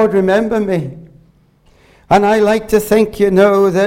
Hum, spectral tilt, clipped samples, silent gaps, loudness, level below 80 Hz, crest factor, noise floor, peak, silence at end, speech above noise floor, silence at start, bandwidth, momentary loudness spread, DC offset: none; -6 dB/octave; under 0.1%; none; -13 LUFS; -42 dBFS; 14 dB; -50 dBFS; 0 dBFS; 0 s; 39 dB; 0 s; 16.5 kHz; 7 LU; under 0.1%